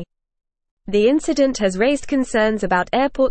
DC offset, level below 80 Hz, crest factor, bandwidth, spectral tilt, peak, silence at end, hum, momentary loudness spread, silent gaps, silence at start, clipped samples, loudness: 0.4%; -42 dBFS; 14 dB; 8.8 kHz; -5 dB/octave; -6 dBFS; 0 s; none; 3 LU; 0.71-0.77 s; 0 s; under 0.1%; -18 LUFS